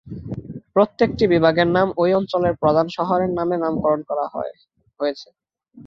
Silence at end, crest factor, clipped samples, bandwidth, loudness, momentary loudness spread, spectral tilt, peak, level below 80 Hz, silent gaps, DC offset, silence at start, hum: 0 s; 18 dB; under 0.1%; 7 kHz; -20 LUFS; 16 LU; -8 dB/octave; -2 dBFS; -50 dBFS; none; under 0.1%; 0.05 s; none